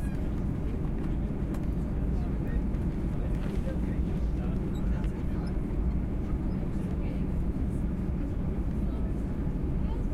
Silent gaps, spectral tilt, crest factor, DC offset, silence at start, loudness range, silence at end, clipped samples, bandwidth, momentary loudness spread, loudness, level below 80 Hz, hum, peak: none; -9.5 dB/octave; 12 dB; under 0.1%; 0 s; 0 LU; 0 s; under 0.1%; 10 kHz; 1 LU; -32 LUFS; -32 dBFS; none; -18 dBFS